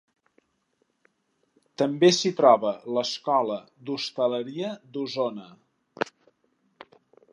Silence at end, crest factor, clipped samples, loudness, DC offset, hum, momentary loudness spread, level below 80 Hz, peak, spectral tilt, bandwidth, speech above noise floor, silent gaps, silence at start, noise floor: 1.3 s; 24 dB; under 0.1%; -25 LUFS; under 0.1%; none; 14 LU; -82 dBFS; -4 dBFS; -4.5 dB/octave; 10.5 kHz; 48 dB; none; 1.8 s; -73 dBFS